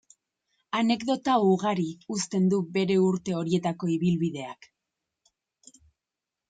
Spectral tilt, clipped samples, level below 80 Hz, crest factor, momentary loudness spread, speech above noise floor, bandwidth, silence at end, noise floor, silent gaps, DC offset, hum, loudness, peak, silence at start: -6 dB/octave; under 0.1%; -68 dBFS; 16 dB; 8 LU; 63 dB; 9.2 kHz; 1.95 s; -88 dBFS; none; under 0.1%; none; -26 LUFS; -12 dBFS; 0.75 s